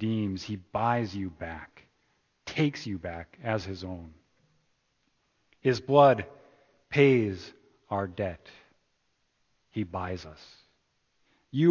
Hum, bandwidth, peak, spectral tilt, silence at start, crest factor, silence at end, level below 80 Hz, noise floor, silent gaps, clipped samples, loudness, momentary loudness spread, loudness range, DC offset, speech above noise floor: none; 7.2 kHz; -6 dBFS; -7 dB/octave; 0 s; 24 dB; 0 s; -56 dBFS; -74 dBFS; none; under 0.1%; -29 LUFS; 19 LU; 11 LU; under 0.1%; 46 dB